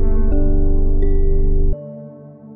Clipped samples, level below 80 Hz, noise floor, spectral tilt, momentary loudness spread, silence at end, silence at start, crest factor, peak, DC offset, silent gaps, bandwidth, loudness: under 0.1%; -14 dBFS; -37 dBFS; -14 dB/octave; 16 LU; 0.45 s; 0 s; 8 dB; -4 dBFS; under 0.1%; none; 2.1 kHz; -21 LUFS